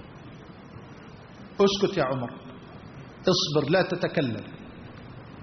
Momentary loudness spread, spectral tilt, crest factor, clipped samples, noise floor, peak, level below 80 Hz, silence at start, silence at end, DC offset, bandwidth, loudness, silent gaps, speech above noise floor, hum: 22 LU; -4 dB/octave; 20 dB; under 0.1%; -45 dBFS; -10 dBFS; -58 dBFS; 0 s; 0 s; under 0.1%; 6.4 kHz; -26 LUFS; none; 21 dB; none